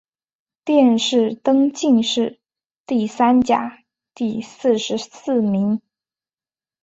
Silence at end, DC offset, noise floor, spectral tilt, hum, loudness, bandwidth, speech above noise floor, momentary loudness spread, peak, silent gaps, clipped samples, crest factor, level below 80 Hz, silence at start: 1.05 s; under 0.1%; under -90 dBFS; -5 dB/octave; none; -19 LUFS; 8 kHz; over 72 dB; 11 LU; -4 dBFS; 2.65-2.70 s, 2.77-2.84 s; under 0.1%; 16 dB; -60 dBFS; 0.65 s